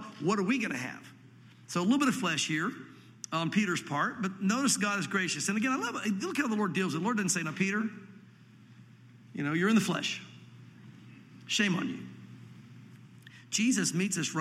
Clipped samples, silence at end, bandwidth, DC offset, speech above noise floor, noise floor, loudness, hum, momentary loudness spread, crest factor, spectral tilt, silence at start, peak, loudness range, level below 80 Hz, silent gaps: under 0.1%; 0 s; 15 kHz; under 0.1%; 25 dB; -55 dBFS; -30 LUFS; none; 20 LU; 18 dB; -4 dB/octave; 0 s; -14 dBFS; 4 LU; -78 dBFS; none